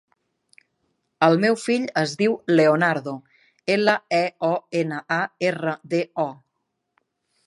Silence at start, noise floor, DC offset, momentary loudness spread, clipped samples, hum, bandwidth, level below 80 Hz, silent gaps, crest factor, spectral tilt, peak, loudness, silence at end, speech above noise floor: 1.2 s; -77 dBFS; under 0.1%; 10 LU; under 0.1%; none; 11.5 kHz; -74 dBFS; none; 20 dB; -5.5 dB/octave; -2 dBFS; -22 LUFS; 1.15 s; 56 dB